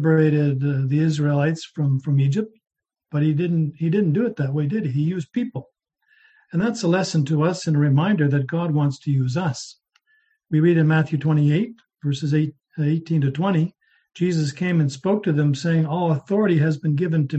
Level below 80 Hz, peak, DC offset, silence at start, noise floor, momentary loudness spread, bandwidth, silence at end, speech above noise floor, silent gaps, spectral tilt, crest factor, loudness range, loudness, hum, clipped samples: -62 dBFS; -6 dBFS; under 0.1%; 0 s; -65 dBFS; 8 LU; 8.4 kHz; 0 s; 45 dB; none; -7.5 dB/octave; 14 dB; 3 LU; -21 LUFS; none; under 0.1%